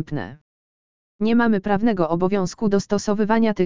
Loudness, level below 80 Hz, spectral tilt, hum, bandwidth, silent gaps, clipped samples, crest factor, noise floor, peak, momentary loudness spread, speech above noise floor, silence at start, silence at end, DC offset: -21 LUFS; -50 dBFS; -6.5 dB/octave; none; 7.6 kHz; 0.41-1.19 s; under 0.1%; 16 dB; under -90 dBFS; -4 dBFS; 9 LU; over 70 dB; 0 s; 0 s; 2%